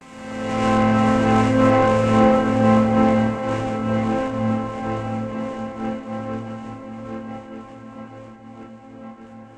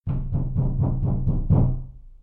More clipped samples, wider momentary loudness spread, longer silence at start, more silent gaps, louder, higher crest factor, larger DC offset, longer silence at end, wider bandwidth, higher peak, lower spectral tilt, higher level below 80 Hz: neither; first, 24 LU vs 8 LU; about the same, 0 s vs 0.05 s; neither; first, -20 LUFS vs -24 LUFS; about the same, 16 dB vs 14 dB; neither; about the same, 0.1 s vs 0.05 s; first, 9.4 kHz vs 1.6 kHz; first, -4 dBFS vs -8 dBFS; second, -7.5 dB/octave vs -13.5 dB/octave; second, -44 dBFS vs -28 dBFS